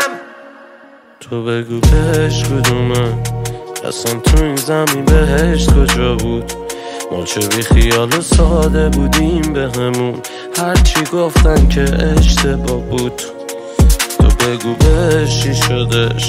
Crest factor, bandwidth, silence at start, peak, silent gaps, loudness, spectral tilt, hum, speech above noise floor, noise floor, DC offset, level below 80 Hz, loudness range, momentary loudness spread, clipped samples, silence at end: 12 dB; 16.5 kHz; 0 s; 0 dBFS; none; -14 LUFS; -5 dB/octave; none; 29 dB; -41 dBFS; under 0.1%; -16 dBFS; 2 LU; 11 LU; under 0.1%; 0 s